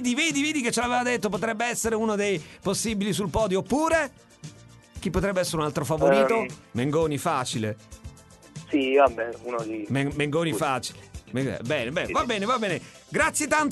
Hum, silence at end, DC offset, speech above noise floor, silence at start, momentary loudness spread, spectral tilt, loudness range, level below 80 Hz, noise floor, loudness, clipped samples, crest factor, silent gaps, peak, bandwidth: none; 0 s; under 0.1%; 21 dB; 0 s; 12 LU; -4.5 dB/octave; 2 LU; -48 dBFS; -47 dBFS; -25 LUFS; under 0.1%; 18 dB; none; -6 dBFS; 12 kHz